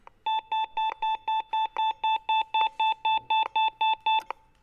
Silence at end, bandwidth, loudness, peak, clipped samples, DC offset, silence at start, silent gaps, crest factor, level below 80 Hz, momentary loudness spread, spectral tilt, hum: 0.4 s; 6.6 kHz; -27 LUFS; -12 dBFS; under 0.1%; under 0.1%; 0.25 s; none; 14 dB; -66 dBFS; 5 LU; -1 dB/octave; none